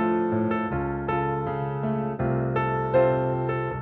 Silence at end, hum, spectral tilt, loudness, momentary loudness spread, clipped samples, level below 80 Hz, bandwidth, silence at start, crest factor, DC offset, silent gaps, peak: 0 s; none; -7.5 dB/octave; -25 LUFS; 6 LU; under 0.1%; -46 dBFS; 4.2 kHz; 0 s; 16 dB; under 0.1%; none; -10 dBFS